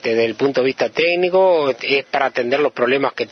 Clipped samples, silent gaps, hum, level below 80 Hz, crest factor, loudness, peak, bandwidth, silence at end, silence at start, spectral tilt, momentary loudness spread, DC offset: under 0.1%; none; none; -66 dBFS; 16 dB; -17 LUFS; -2 dBFS; 6.6 kHz; 0.05 s; 0 s; -5.5 dB/octave; 4 LU; under 0.1%